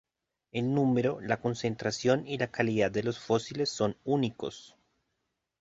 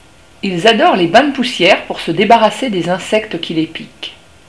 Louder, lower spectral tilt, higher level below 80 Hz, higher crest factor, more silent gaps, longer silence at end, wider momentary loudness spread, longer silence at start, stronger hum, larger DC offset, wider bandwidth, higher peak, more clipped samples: second, -30 LUFS vs -12 LUFS; about the same, -5.5 dB/octave vs -4.5 dB/octave; second, -64 dBFS vs -50 dBFS; first, 20 dB vs 14 dB; neither; first, 0.95 s vs 0.35 s; second, 6 LU vs 14 LU; about the same, 0.55 s vs 0.45 s; neither; second, under 0.1% vs 0.4%; second, 8 kHz vs 11 kHz; second, -10 dBFS vs 0 dBFS; second, under 0.1% vs 0.5%